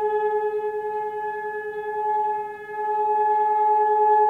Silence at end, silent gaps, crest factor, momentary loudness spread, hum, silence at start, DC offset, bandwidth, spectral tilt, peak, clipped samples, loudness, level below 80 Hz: 0 s; none; 12 dB; 10 LU; none; 0 s; under 0.1%; 4.1 kHz; -5.5 dB/octave; -10 dBFS; under 0.1%; -24 LUFS; -70 dBFS